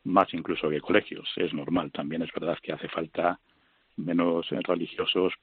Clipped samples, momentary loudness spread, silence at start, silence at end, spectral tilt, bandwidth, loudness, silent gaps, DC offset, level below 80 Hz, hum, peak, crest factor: under 0.1%; 8 LU; 0.05 s; 0.05 s; -3.5 dB/octave; 4.6 kHz; -29 LUFS; none; under 0.1%; -66 dBFS; none; -6 dBFS; 22 dB